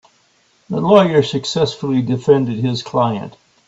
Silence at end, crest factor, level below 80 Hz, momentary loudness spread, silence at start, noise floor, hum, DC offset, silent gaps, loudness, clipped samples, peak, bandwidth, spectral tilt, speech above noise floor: 0.35 s; 16 dB; -56 dBFS; 10 LU; 0.7 s; -57 dBFS; none; under 0.1%; none; -16 LUFS; under 0.1%; 0 dBFS; 8 kHz; -6.5 dB/octave; 42 dB